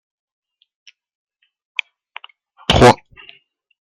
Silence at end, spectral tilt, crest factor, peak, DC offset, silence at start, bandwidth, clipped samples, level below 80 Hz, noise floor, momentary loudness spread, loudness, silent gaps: 1 s; -5 dB/octave; 20 dB; 0 dBFS; under 0.1%; 2.7 s; 13.5 kHz; under 0.1%; -38 dBFS; -49 dBFS; 27 LU; -15 LUFS; none